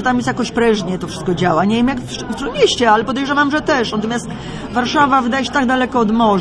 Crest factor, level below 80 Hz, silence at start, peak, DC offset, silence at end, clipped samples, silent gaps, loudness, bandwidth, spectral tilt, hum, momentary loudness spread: 14 dB; -40 dBFS; 0 s; -2 dBFS; under 0.1%; 0 s; under 0.1%; none; -16 LUFS; 11 kHz; -5 dB/octave; none; 9 LU